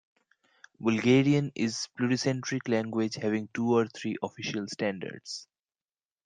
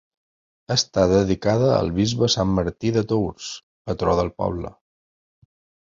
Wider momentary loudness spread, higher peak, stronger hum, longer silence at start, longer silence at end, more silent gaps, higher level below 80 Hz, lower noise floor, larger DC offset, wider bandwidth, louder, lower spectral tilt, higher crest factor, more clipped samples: about the same, 12 LU vs 14 LU; second, -12 dBFS vs -4 dBFS; neither; about the same, 0.8 s vs 0.7 s; second, 0.85 s vs 1.2 s; second, none vs 3.63-3.85 s; second, -70 dBFS vs -42 dBFS; about the same, under -90 dBFS vs under -90 dBFS; neither; first, 9.6 kHz vs 7.8 kHz; second, -29 LUFS vs -21 LUFS; about the same, -5.5 dB/octave vs -5.5 dB/octave; about the same, 18 dB vs 18 dB; neither